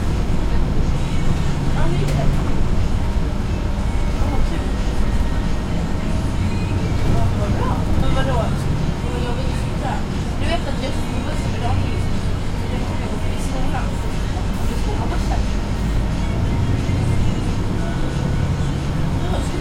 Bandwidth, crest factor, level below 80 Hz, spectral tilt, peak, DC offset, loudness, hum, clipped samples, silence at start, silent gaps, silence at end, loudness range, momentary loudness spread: 12.5 kHz; 14 dB; -22 dBFS; -6.5 dB/octave; -4 dBFS; under 0.1%; -22 LUFS; none; under 0.1%; 0 s; none; 0 s; 2 LU; 4 LU